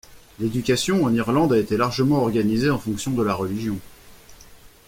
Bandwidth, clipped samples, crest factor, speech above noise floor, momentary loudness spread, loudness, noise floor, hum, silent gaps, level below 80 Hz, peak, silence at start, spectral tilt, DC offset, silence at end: 16.5 kHz; under 0.1%; 16 dB; 26 dB; 8 LU; -22 LUFS; -47 dBFS; none; none; -48 dBFS; -6 dBFS; 0.1 s; -6 dB/octave; under 0.1%; 0.2 s